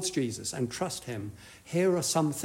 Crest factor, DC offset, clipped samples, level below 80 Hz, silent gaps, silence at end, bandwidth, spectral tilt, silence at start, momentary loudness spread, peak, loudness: 16 dB; under 0.1%; under 0.1%; -64 dBFS; none; 0 s; 16 kHz; -4.5 dB/octave; 0 s; 13 LU; -16 dBFS; -31 LUFS